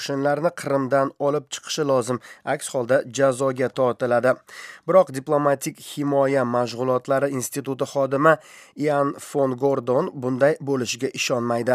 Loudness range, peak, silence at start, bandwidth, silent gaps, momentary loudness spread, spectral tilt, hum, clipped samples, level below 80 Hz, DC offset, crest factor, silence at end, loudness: 1 LU; -2 dBFS; 0 s; 15.5 kHz; none; 8 LU; -5 dB/octave; none; under 0.1%; -76 dBFS; under 0.1%; 20 dB; 0 s; -22 LUFS